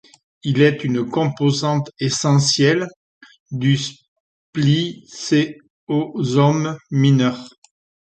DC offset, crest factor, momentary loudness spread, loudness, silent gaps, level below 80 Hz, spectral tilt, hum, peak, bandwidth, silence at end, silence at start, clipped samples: under 0.1%; 16 dB; 13 LU; -19 LUFS; 2.96-3.21 s, 3.40-3.46 s, 4.08-4.53 s, 5.70-5.87 s; -58 dBFS; -5.5 dB/octave; none; -2 dBFS; 9 kHz; 0.55 s; 0.45 s; under 0.1%